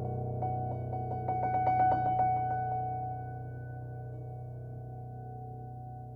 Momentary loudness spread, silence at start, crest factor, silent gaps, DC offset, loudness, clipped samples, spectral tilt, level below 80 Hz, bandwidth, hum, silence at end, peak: 16 LU; 0 s; 16 dB; none; under 0.1%; -34 LUFS; under 0.1%; -10.5 dB/octave; -56 dBFS; 4.8 kHz; none; 0 s; -18 dBFS